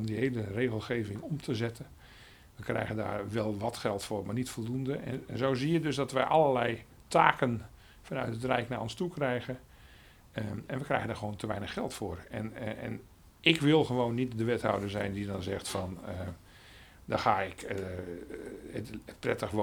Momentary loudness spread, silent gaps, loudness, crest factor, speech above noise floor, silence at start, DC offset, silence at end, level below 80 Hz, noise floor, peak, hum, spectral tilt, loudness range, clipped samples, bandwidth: 16 LU; none; -33 LUFS; 28 dB; 24 dB; 0 s; under 0.1%; 0 s; -58 dBFS; -56 dBFS; -4 dBFS; none; -5.5 dB/octave; 7 LU; under 0.1%; over 20 kHz